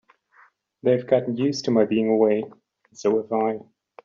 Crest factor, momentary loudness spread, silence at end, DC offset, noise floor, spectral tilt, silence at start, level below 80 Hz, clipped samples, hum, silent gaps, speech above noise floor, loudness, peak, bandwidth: 18 dB; 7 LU; 0.4 s; under 0.1%; -58 dBFS; -6 dB/octave; 0.85 s; -70 dBFS; under 0.1%; none; none; 36 dB; -22 LUFS; -6 dBFS; 7.4 kHz